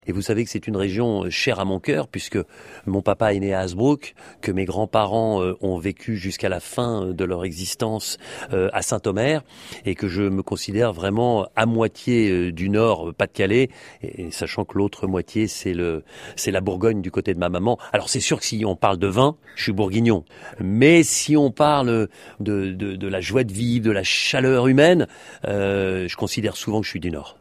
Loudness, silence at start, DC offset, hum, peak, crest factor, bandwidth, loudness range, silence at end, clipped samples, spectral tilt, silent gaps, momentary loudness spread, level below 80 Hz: -22 LUFS; 0.05 s; under 0.1%; none; 0 dBFS; 20 dB; 15.5 kHz; 5 LU; 0.1 s; under 0.1%; -5 dB/octave; none; 10 LU; -50 dBFS